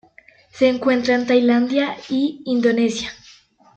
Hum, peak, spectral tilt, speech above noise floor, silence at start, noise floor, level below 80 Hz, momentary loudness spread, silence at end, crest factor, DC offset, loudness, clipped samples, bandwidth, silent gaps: none; -4 dBFS; -4.5 dB/octave; 33 dB; 0.55 s; -51 dBFS; -60 dBFS; 6 LU; 0.6 s; 16 dB; under 0.1%; -19 LUFS; under 0.1%; 8.4 kHz; none